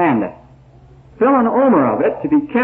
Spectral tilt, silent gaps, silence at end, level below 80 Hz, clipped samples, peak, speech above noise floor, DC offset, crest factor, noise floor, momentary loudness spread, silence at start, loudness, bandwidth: -10.5 dB/octave; none; 0 s; -50 dBFS; under 0.1%; -2 dBFS; 30 dB; under 0.1%; 12 dB; -44 dBFS; 6 LU; 0 s; -15 LUFS; 3.7 kHz